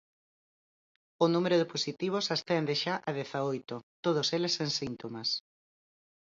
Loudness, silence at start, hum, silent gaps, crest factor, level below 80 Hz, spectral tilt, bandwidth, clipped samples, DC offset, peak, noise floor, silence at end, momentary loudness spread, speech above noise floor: -31 LUFS; 1.2 s; none; 3.83-4.03 s; 20 dB; -74 dBFS; -4.5 dB/octave; 7.8 kHz; under 0.1%; under 0.1%; -12 dBFS; under -90 dBFS; 0.95 s; 7 LU; over 59 dB